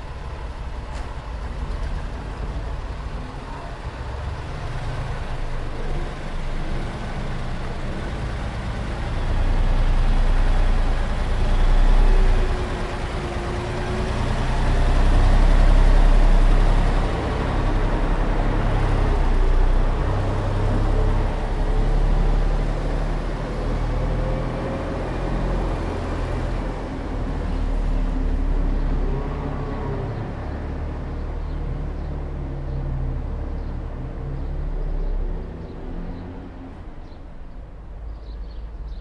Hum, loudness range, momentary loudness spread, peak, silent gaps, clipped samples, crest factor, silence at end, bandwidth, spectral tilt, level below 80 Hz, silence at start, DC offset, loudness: none; 10 LU; 13 LU; -6 dBFS; none; under 0.1%; 14 dB; 0 s; 8 kHz; -7 dB/octave; -22 dBFS; 0 s; under 0.1%; -26 LUFS